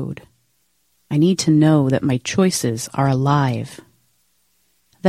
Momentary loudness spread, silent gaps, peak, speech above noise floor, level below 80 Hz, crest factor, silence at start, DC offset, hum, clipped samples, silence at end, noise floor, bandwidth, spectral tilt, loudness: 13 LU; none; -2 dBFS; 48 dB; -54 dBFS; 18 dB; 0 s; under 0.1%; none; under 0.1%; 0 s; -65 dBFS; 15 kHz; -6 dB/octave; -18 LUFS